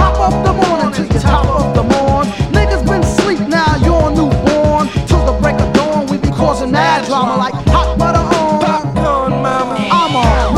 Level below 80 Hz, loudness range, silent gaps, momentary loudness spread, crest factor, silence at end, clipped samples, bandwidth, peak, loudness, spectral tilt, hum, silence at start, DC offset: -20 dBFS; 1 LU; none; 3 LU; 12 dB; 0 s; under 0.1%; 12 kHz; 0 dBFS; -13 LUFS; -6 dB/octave; none; 0 s; under 0.1%